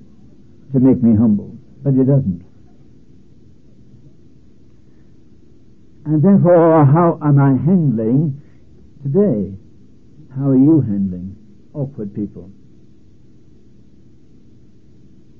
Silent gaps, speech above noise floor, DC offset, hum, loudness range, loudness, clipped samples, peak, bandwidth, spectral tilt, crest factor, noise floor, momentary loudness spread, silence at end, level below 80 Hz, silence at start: none; 35 dB; 0.7%; none; 18 LU; -15 LUFS; under 0.1%; -2 dBFS; 2.8 kHz; -13.5 dB/octave; 16 dB; -48 dBFS; 20 LU; 2.9 s; -52 dBFS; 0.7 s